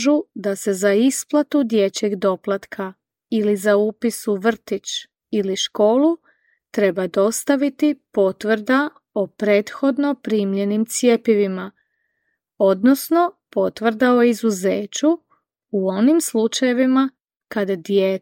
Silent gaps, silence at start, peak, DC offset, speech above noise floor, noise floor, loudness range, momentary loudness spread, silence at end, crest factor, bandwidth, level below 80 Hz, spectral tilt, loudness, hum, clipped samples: none; 0 s; -2 dBFS; under 0.1%; 55 dB; -73 dBFS; 2 LU; 9 LU; 0.05 s; 16 dB; 17 kHz; -68 dBFS; -4.5 dB/octave; -19 LUFS; none; under 0.1%